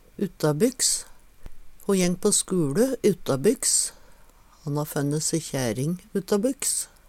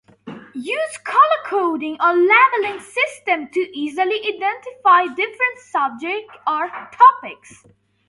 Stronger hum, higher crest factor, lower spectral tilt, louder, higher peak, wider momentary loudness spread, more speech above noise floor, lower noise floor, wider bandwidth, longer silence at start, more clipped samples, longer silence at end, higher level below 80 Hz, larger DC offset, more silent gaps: neither; about the same, 18 dB vs 18 dB; about the same, -4 dB/octave vs -3 dB/octave; second, -24 LUFS vs -17 LUFS; second, -8 dBFS vs 0 dBFS; second, 9 LU vs 13 LU; first, 28 dB vs 20 dB; first, -52 dBFS vs -38 dBFS; first, 17 kHz vs 11.5 kHz; about the same, 0.2 s vs 0.25 s; neither; second, 0.25 s vs 0.75 s; first, -50 dBFS vs -72 dBFS; neither; neither